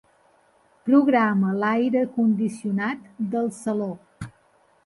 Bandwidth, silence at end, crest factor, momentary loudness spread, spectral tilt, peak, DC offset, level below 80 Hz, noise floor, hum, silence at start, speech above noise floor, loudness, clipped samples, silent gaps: 11.5 kHz; 0.55 s; 16 dB; 16 LU; -7.5 dB/octave; -8 dBFS; under 0.1%; -62 dBFS; -61 dBFS; none; 0.85 s; 39 dB; -23 LUFS; under 0.1%; none